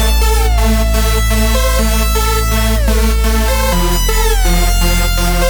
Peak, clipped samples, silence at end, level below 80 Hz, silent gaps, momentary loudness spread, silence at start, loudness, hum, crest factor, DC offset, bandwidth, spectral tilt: 0 dBFS; under 0.1%; 0 s; -12 dBFS; none; 1 LU; 0 s; -13 LUFS; none; 10 dB; under 0.1%; over 20 kHz; -4 dB/octave